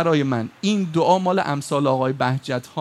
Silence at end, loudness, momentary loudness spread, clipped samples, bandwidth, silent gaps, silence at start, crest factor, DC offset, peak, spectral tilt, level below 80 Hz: 0 s; -21 LUFS; 6 LU; under 0.1%; 13.5 kHz; none; 0 s; 16 dB; under 0.1%; -4 dBFS; -6 dB/octave; -64 dBFS